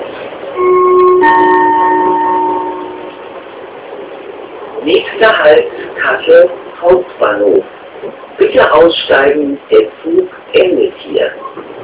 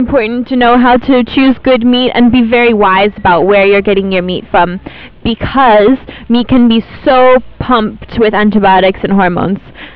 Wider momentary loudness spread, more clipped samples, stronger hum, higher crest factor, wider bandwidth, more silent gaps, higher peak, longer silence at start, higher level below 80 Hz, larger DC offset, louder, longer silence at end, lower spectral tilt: first, 20 LU vs 8 LU; first, 2% vs under 0.1%; neither; about the same, 10 dB vs 8 dB; second, 4 kHz vs 5 kHz; neither; about the same, 0 dBFS vs 0 dBFS; about the same, 0 s vs 0 s; second, -48 dBFS vs -32 dBFS; neither; about the same, -10 LUFS vs -9 LUFS; about the same, 0 s vs 0.05 s; second, -8 dB/octave vs -9.5 dB/octave